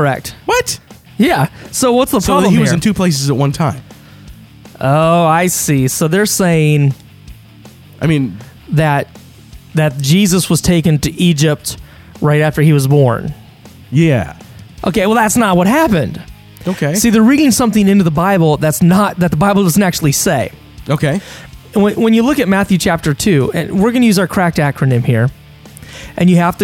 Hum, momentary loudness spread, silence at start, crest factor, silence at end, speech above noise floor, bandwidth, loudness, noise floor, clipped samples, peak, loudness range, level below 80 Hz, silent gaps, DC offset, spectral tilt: none; 10 LU; 0 s; 12 dB; 0 s; 27 dB; 17 kHz; -12 LUFS; -38 dBFS; under 0.1%; 0 dBFS; 3 LU; -38 dBFS; none; under 0.1%; -5.5 dB/octave